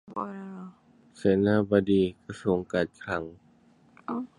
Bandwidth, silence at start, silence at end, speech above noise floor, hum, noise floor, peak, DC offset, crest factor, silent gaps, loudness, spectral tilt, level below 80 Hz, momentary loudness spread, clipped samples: 10.5 kHz; 0.1 s; 0.1 s; 33 dB; none; -60 dBFS; -8 dBFS; under 0.1%; 20 dB; none; -27 LUFS; -7.5 dB/octave; -56 dBFS; 20 LU; under 0.1%